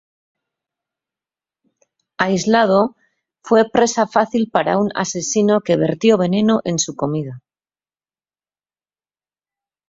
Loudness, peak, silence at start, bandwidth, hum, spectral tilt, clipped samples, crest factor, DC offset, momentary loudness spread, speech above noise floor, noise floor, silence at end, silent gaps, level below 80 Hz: -17 LUFS; -2 dBFS; 2.2 s; 7.8 kHz; none; -4.5 dB/octave; under 0.1%; 18 dB; under 0.1%; 7 LU; over 74 dB; under -90 dBFS; 2.5 s; none; -58 dBFS